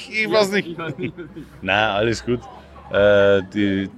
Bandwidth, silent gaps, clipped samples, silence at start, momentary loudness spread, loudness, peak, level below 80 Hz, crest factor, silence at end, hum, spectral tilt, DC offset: 13.5 kHz; none; under 0.1%; 0 s; 15 LU; -19 LUFS; -2 dBFS; -46 dBFS; 18 dB; 0 s; none; -5.5 dB/octave; under 0.1%